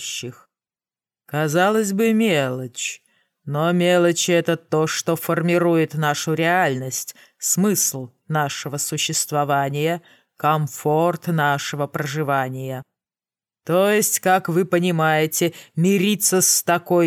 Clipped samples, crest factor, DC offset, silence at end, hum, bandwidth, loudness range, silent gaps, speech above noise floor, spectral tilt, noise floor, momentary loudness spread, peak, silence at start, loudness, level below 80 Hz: under 0.1%; 16 dB; under 0.1%; 0 s; none; 19 kHz; 3 LU; none; over 70 dB; -4 dB/octave; under -90 dBFS; 11 LU; -4 dBFS; 0 s; -20 LUFS; -74 dBFS